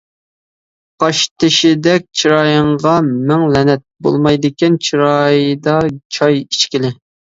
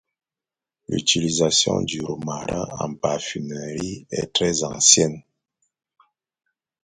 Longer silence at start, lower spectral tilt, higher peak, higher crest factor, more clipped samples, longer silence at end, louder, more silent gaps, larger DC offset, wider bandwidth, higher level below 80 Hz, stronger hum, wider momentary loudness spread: about the same, 1 s vs 0.9 s; first, -5 dB/octave vs -2.5 dB/octave; about the same, 0 dBFS vs 0 dBFS; second, 14 dB vs 24 dB; neither; second, 0.45 s vs 1.65 s; first, -13 LUFS vs -21 LUFS; first, 1.31-1.36 s, 6.05-6.10 s vs none; neither; second, 7.8 kHz vs 11 kHz; about the same, -48 dBFS vs -52 dBFS; neither; second, 5 LU vs 15 LU